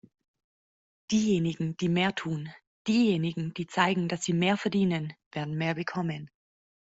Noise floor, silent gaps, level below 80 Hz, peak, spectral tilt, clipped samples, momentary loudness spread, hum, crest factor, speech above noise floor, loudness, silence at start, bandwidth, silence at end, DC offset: under -90 dBFS; 2.67-2.85 s, 5.26-5.31 s; -66 dBFS; -10 dBFS; -5.5 dB/octave; under 0.1%; 11 LU; none; 18 dB; over 62 dB; -29 LUFS; 1.1 s; 8 kHz; 0.7 s; under 0.1%